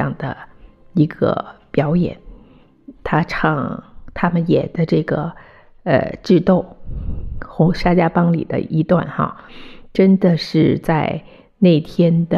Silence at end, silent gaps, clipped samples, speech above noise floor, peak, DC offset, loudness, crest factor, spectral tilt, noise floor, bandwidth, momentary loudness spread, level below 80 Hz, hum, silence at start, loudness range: 0 s; none; under 0.1%; 31 dB; -2 dBFS; under 0.1%; -17 LUFS; 16 dB; -8.5 dB/octave; -47 dBFS; 6.8 kHz; 15 LU; -36 dBFS; none; 0 s; 4 LU